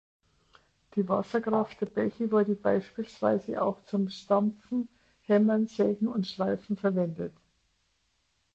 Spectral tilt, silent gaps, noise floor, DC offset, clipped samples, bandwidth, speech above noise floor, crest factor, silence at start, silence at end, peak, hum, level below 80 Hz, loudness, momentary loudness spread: -8 dB/octave; none; -74 dBFS; under 0.1%; under 0.1%; 7.6 kHz; 46 dB; 18 dB; 0.95 s; 1.25 s; -12 dBFS; none; -68 dBFS; -29 LUFS; 8 LU